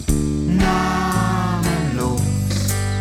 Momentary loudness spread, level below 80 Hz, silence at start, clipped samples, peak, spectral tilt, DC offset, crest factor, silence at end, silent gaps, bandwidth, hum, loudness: 3 LU; -28 dBFS; 0 s; under 0.1%; -4 dBFS; -5.5 dB/octave; under 0.1%; 14 dB; 0 s; none; 17 kHz; none; -19 LUFS